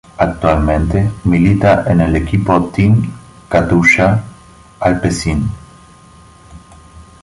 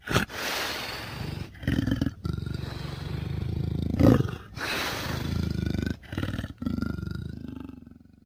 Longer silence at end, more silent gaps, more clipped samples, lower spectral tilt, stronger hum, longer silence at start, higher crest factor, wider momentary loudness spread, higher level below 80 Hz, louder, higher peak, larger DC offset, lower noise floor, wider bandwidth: about the same, 0.2 s vs 0.3 s; neither; neither; about the same, -7 dB/octave vs -6 dB/octave; neither; first, 0.2 s vs 0.05 s; second, 14 dB vs 24 dB; about the same, 9 LU vs 11 LU; first, -28 dBFS vs -40 dBFS; first, -13 LUFS vs -30 LUFS; first, 0 dBFS vs -6 dBFS; neither; second, -41 dBFS vs -50 dBFS; second, 11.5 kHz vs 16.5 kHz